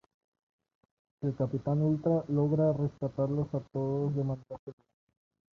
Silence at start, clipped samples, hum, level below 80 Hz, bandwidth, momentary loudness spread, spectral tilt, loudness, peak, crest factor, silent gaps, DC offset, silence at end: 1.2 s; under 0.1%; none; -62 dBFS; 6.4 kHz; 10 LU; -11.5 dB/octave; -31 LUFS; -18 dBFS; 16 dB; 4.59-4.67 s; under 0.1%; 0.85 s